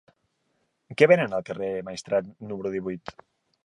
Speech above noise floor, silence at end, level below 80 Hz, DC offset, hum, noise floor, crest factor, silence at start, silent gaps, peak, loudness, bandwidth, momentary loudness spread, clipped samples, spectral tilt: 48 dB; 0.65 s; -64 dBFS; under 0.1%; none; -73 dBFS; 24 dB; 0.9 s; none; -2 dBFS; -25 LUFS; 11 kHz; 19 LU; under 0.1%; -6 dB/octave